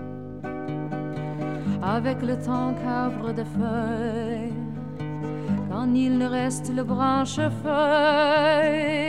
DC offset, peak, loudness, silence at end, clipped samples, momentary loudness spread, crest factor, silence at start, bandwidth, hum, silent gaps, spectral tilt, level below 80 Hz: 0.5%; -8 dBFS; -25 LUFS; 0 s; under 0.1%; 12 LU; 16 dB; 0 s; 12 kHz; none; none; -6 dB/octave; -54 dBFS